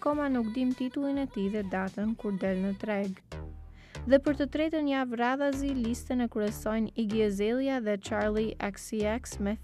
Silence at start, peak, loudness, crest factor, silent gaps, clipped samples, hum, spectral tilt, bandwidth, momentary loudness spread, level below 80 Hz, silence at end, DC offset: 0 s; -10 dBFS; -30 LUFS; 20 dB; none; under 0.1%; none; -6 dB/octave; 14 kHz; 6 LU; -48 dBFS; 0 s; under 0.1%